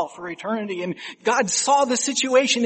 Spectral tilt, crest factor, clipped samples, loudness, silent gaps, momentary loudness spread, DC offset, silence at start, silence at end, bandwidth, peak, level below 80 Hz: -2 dB/octave; 18 dB; under 0.1%; -21 LUFS; none; 11 LU; under 0.1%; 0 s; 0 s; 8.8 kHz; -4 dBFS; -72 dBFS